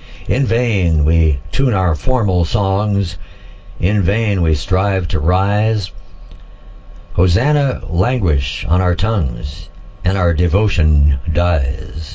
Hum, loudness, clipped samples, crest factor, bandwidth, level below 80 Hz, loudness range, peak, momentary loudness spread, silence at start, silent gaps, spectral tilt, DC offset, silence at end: none; -16 LUFS; under 0.1%; 14 dB; 8 kHz; -20 dBFS; 2 LU; 0 dBFS; 8 LU; 0 s; none; -7.5 dB/octave; under 0.1%; 0 s